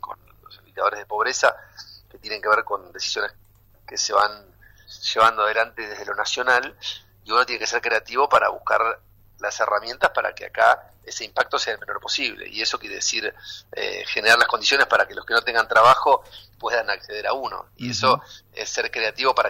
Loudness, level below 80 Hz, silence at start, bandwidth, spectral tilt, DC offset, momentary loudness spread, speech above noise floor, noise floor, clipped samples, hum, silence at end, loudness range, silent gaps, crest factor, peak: -21 LUFS; -58 dBFS; 0.05 s; 16 kHz; -1 dB/octave; under 0.1%; 15 LU; 27 dB; -49 dBFS; under 0.1%; none; 0 s; 6 LU; none; 18 dB; -4 dBFS